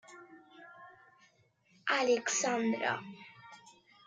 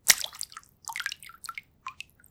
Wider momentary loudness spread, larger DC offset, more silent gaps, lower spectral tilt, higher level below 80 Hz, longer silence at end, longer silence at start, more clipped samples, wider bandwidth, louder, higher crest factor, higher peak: first, 25 LU vs 20 LU; neither; neither; first, -2.5 dB/octave vs 2.5 dB/octave; second, -86 dBFS vs -66 dBFS; about the same, 0.35 s vs 0.4 s; about the same, 0.1 s vs 0.05 s; neither; second, 10 kHz vs over 20 kHz; about the same, -32 LUFS vs -31 LUFS; second, 18 dB vs 32 dB; second, -18 dBFS vs 0 dBFS